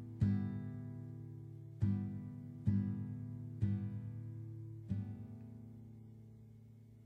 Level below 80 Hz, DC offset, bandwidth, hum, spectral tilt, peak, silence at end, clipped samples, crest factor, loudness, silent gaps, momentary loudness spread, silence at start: -62 dBFS; under 0.1%; 4.5 kHz; none; -10.5 dB/octave; -22 dBFS; 0 s; under 0.1%; 20 dB; -42 LUFS; none; 20 LU; 0 s